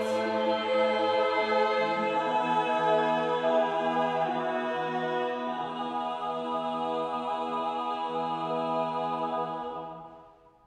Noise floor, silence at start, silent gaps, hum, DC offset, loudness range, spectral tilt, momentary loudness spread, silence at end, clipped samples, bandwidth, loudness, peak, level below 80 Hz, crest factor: -55 dBFS; 0 s; none; none; under 0.1%; 5 LU; -5.5 dB/octave; 7 LU; 0.35 s; under 0.1%; 11 kHz; -29 LUFS; -14 dBFS; -74 dBFS; 16 dB